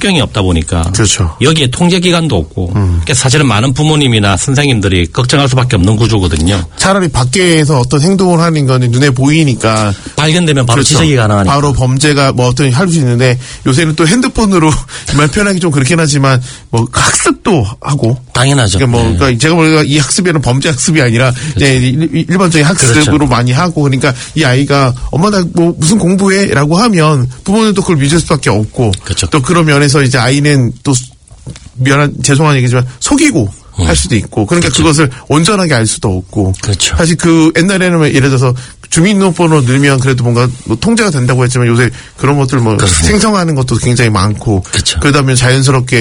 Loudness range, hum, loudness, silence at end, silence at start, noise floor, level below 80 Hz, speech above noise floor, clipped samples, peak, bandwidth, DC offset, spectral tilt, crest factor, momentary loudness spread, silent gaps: 1 LU; none; -9 LUFS; 0 s; 0 s; -29 dBFS; -28 dBFS; 20 dB; 0.5%; 0 dBFS; 11 kHz; under 0.1%; -5 dB/octave; 8 dB; 5 LU; none